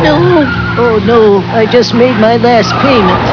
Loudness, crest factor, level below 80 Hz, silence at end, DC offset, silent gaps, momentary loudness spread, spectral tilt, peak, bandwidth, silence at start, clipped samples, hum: -8 LUFS; 8 dB; -32 dBFS; 0 s; under 0.1%; none; 3 LU; -6.5 dB/octave; 0 dBFS; 5.4 kHz; 0 s; 1%; none